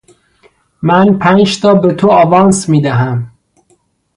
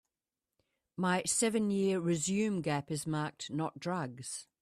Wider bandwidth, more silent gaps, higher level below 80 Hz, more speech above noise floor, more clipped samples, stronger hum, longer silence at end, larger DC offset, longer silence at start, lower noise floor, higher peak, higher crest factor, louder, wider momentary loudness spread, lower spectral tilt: second, 11 kHz vs 14.5 kHz; neither; first, -48 dBFS vs -72 dBFS; second, 47 dB vs over 57 dB; neither; neither; first, 0.9 s vs 0.2 s; neither; second, 0.8 s vs 1 s; second, -55 dBFS vs under -90 dBFS; first, 0 dBFS vs -18 dBFS; second, 10 dB vs 16 dB; first, -10 LUFS vs -34 LUFS; about the same, 10 LU vs 9 LU; first, -6 dB/octave vs -4.5 dB/octave